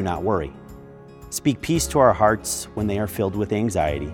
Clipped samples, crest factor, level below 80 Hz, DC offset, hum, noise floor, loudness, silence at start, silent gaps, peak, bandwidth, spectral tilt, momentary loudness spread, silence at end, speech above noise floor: under 0.1%; 20 dB; -42 dBFS; under 0.1%; none; -42 dBFS; -22 LUFS; 0 s; none; -2 dBFS; 18.5 kHz; -5 dB/octave; 12 LU; 0 s; 21 dB